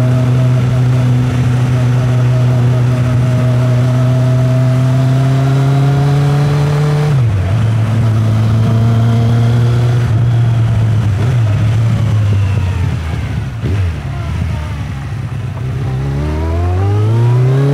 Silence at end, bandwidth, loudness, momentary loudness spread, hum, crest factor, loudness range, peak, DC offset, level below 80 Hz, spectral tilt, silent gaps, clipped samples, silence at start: 0 s; 10.5 kHz; -13 LUFS; 7 LU; none; 10 dB; 6 LU; -2 dBFS; under 0.1%; -30 dBFS; -8 dB/octave; none; under 0.1%; 0 s